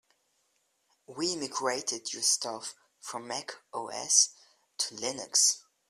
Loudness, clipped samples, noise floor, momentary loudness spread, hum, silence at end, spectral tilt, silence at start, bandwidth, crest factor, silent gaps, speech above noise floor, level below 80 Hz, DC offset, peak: -28 LUFS; under 0.1%; -75 dBFS; 18 LU; none; 0.3 s; 0 dB/octave; 1.1 s; 15 kHz; 26 dB; none; 43 dB; -80 dBFS; under 0.1%; -8 dBFS